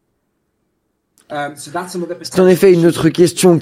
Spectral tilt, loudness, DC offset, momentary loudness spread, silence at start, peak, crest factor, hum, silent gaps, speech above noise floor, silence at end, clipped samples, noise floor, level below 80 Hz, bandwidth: -6 dB/octave; -13 LUFS; under 0.1%; 15 LU; 1.3 s; 0 dBFS; 14 dB; none; none; 55 dB; 0 s; under 0.1%; -67 dBFS; -52 dBFS; 16 kHz